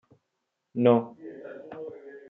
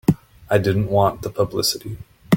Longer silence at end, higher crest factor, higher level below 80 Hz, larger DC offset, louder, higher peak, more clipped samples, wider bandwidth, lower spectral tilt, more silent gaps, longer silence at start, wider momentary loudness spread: about the same, 0.1 s vs 0 s; about the same, 22 dB vs 18 dB; second, -80 dBFS vs -46 dBFS; neither; second, -24 LUFS vs -21 LUFS; second, -6 dBFS vs -2 dBFS; neither; second, 3.8 kHz vs 17 kHz; first, -7 dB/octave vs -5.5 dB/octave; neither; first, 0.75 s vs 0.1 s; first, 20 LU vs 12 LU